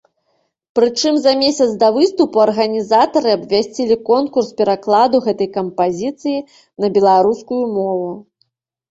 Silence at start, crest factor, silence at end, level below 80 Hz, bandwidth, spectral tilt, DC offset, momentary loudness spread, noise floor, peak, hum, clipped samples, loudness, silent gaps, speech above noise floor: 0.75 s; 14 dB; 0.7 s; -58 dBFS; 8 kHz; -4.5 dB/octave; under 0.1%; 9 LU; -66 dBFS; -2 dBFS; none; under 0.1%; -15 LUFS; none; 51 dB